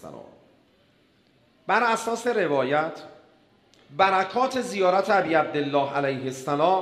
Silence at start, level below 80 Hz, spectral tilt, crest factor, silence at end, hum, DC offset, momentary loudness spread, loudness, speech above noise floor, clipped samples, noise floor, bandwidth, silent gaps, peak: 0.05 s; -72 dBFS; -4.5 dB/octave; 20 dB; 0 s; none; under 0.1%; 10 LU; -24 LUFS; 38 dB; under 0.1%; -62 dBFS; 14.5 kHz; none; -6 dBFS